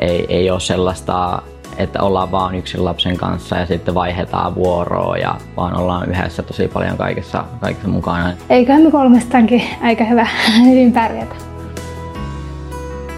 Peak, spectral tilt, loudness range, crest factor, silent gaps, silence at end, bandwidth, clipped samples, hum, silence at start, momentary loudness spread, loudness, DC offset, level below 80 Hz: 0 dBFS; -6 dB/octave; 7 LU; 14 dB; none; 0 s; 12.5 kHz; under 0.1%; none; 0 s; 17 LU; -15 LUFS; under 0.1%; -36 dBFS